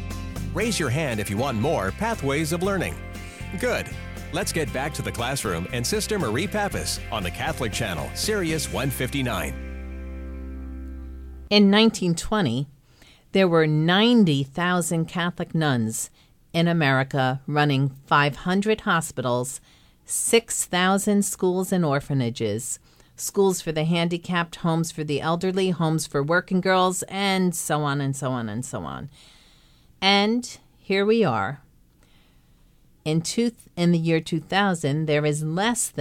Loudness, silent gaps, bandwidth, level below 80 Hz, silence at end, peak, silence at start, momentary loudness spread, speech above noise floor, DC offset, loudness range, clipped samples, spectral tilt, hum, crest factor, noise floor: -23 LUFS; none; 16.5 kHz; -42 dBFS; 0 s; -4 dBFS; 0 s; 14 LU; 33 dB; under 0.1%; 5 LU; under 0.1%; -4.5 dB/octave; none; 20 dB; -56 dBFS